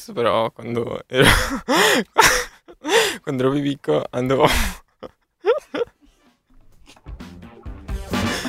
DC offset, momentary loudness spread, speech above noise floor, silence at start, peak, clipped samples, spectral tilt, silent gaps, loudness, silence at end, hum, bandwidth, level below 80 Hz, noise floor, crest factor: under 0.1%; 23 LU; 38 dB; 0 s; 0 dBFS; under 0.1%; -3.5 dB/octave; none; -19 LUFS; 0 s; none; 16 kHz; -34 dBFS; -56 dBFS; 20 dB